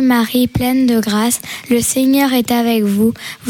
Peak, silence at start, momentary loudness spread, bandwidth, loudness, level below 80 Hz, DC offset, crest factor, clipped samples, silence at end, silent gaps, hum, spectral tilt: -4 dBFS; 0 s; 4 LU; 17.5 kHz; -14 LUFS; -42 dBFS; under 0.1%; 10 dB; under 0.1%; 0 s; none; none; -4 dB/octave